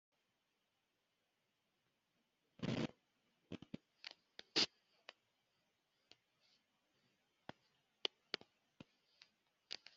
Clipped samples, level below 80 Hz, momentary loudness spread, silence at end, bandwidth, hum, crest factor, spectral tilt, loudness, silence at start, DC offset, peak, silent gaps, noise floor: under 0.1%; -84 dBFS; 24 LU; 0.2 s; 7.4 kHz; none; 34 dB; -2.5 dB/octave; -44 LUFS; 2.6 s; under 0.1%; -18 dBFS; none; -86 dBFS